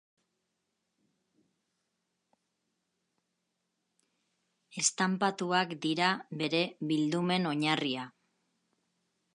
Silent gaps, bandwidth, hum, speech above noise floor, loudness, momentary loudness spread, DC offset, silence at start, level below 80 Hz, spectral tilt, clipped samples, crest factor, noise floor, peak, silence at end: none; 11 kHz; none; 52 dB; -31 LUFS; 6 LU; under 0.1%; 4.75 s; -84 dBFS; -3.5 dB/octave; under 0.1%; 22 dB; -83 dBFS; -12 dBFS; 1.25 s